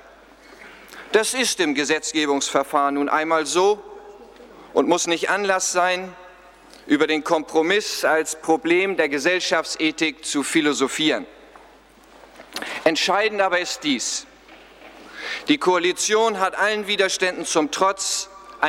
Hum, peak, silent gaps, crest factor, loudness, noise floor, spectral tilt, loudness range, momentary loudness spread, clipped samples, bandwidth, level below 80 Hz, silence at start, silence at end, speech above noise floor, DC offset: none; -2 dBFS; none; 20 dB; -20 LUFS; -50 dBFS; -2 dB/octave; 3 LU; 8 LU; under 0.1%; 16 kHz; -62 dBFS; 0.6 s; 0 s; 29 dB; under 0.1%